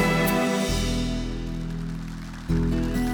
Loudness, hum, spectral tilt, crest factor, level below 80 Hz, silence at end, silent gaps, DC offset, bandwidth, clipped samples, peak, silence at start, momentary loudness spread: -26 LUFS; none; -5.5 dB/octave; 14 dB; -32 dBFS; 0 s; none; under 0.1%; over 20 kHz; under 0.1%; -10 dBFS; 0 s; 12 LU